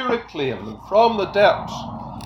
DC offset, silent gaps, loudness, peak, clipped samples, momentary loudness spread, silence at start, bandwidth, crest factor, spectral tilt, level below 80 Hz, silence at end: under 0.1%; none; -19 LUFS; -2 dBFS; under 0.1%; 14 LU; 0 s; 11.5 kHz; 18 dB; -5.5 dB/octave; -48 dBFS; 0 s